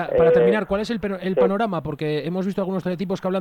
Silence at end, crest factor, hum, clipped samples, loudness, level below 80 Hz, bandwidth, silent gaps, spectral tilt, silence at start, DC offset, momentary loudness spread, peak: 0 s; 16 dB; none; under 0.1%; -22 LUFS; -50 dBFS; 9.8 kHz; none; -7.5 dB/octave; 0 s; under 0.1%; 9 LU; -6 dBFS